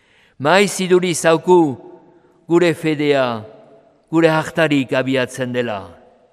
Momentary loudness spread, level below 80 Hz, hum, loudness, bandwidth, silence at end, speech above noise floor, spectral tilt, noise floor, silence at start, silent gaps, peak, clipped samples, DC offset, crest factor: 8 LU; -62 dBFS; none; -16 LUFS; 14.5 kHz; 0.4 s; 34 dB; -5 dB/octave; -50 dBFS; 0.4 s; none; 0 dBFS; under 0.1%; under 0.1%; 18 dB